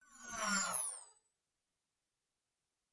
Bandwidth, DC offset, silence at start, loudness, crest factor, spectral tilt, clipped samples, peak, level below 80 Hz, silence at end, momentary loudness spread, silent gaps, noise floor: 11.5 kHz; under 0.1%; 0.1 s; -38 LUFS; 22 dB; -1 dB/octave; under 0.1%; -24 dBFS; -78 dBFS; 1.85 s; 13 LU; none; under -90 dBFS